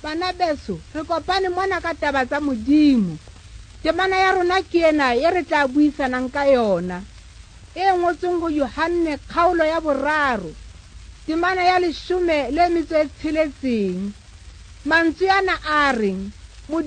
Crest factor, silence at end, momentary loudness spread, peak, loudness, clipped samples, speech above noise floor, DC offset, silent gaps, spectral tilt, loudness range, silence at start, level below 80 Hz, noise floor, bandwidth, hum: 14 dB; 0 s; 10 LU; -6 dBFS; -20 LUFS; under 0.1%; 23 dB; under 0.1%; none; -5.5 dB/octave; 3 LU; 0 s; -42 dBFS; -42 dBFS; 9.6 kHz; none